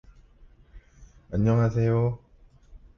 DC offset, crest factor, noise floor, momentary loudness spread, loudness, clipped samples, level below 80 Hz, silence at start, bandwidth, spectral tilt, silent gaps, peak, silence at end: under 0.1%; 16 dB; -54 dBFS; 10 LU; -25 LUFS; under 0.1%; -48 dBFS; 0.75 s; 6.6 kHz; -9.5 dB/octave; none; -12 dBFS; 0.2 s